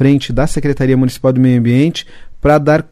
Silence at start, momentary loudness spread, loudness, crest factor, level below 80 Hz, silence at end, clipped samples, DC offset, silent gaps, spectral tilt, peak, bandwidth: 0 s; 6 LU; -13 LUFS; 10 dB; -30 dBFS; 0.1 s; under 0.1%; under 0.1%; none; -7 dB/octave; 0 dBFS; 14.5 kHz